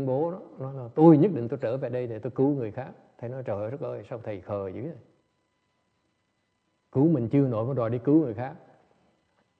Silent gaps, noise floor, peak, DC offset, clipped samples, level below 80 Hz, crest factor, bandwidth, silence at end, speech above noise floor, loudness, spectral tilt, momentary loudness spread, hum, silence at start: none; -74 dBFS; -6 dBFS; under 0.1%; under 0.1%; -68 dBFS; 22 dB; 4.5 kHz; 1.05 s; 49 dB; -26 LUFS; -11.5 dB/octave; 17 LU; none; 0 s